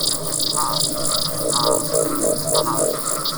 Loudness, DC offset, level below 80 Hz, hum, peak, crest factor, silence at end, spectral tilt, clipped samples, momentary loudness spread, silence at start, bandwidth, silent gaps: -19 LUFS; under 0.1%; -46 dBFS; none; -2 dBFS; 18 dB; 0 s; -2.5 dB/octave; under 0.1%; 2 LU; 0 s; over 20 kHz; none